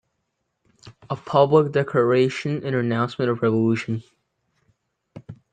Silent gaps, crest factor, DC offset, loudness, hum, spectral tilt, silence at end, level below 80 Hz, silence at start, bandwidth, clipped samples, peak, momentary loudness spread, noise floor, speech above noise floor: none; 20 dB; under 0.1%; -21 LUFS; none; -7.5 dB/octave; 0.2 s; -64 dBFS; 0.85 s; 9 kHz; under 0.1%; -2 dBFS; 15 LU; -76 dBFS; 55 dB